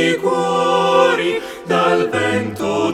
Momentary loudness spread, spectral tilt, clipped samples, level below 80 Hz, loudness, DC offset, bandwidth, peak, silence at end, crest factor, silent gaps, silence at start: 7 LU; -4.5 dB/octave; under 0.1%; -56 dBFS; -16 LUFS; under 0.1%; 14.5 kHz; -2 dBFS; 0 s; 16 dB; none; 0 s